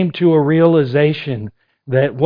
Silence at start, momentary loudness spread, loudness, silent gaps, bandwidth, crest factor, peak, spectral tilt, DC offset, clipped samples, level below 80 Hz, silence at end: 0 s; 13 LU; -15 LUFS; none; 5.2 kHz; 14 dB; 0 dBFS; -10.5 dB/octave; under 0.1%; under 0.1%; -54 dBFS; 0 s